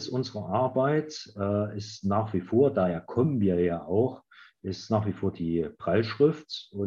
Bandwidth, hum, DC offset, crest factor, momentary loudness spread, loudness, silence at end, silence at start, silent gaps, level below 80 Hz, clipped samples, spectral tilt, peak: 7.4 kHz; none; under 0.1%; 18 dB; 11 LU; -28 LUFS; 0 s; 0 s; none; -64 dBFS; under 0.1%; -7.5 dB/octave; -10 dBFS